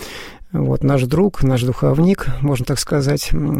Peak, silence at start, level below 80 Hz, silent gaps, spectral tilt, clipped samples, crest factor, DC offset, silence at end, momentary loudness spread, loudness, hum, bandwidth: -2 dBFS; 0 s; -28 dBFS; none; -6.5 dB/octave; under 0.1%; 14 dB; 0.8%; 0 s; 6 LU; -17 LUFS; none; 16 kHz